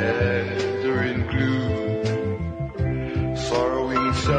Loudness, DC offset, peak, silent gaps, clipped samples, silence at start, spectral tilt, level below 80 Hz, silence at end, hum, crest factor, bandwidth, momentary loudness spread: -24 LUFS; under 0.1%; -10 dBFS; none; under 0.1%; 0 s; -6.5 dB/octave; -40 dBFS; 0 s; none; 14 dB; 9.8 kHz; 4 LU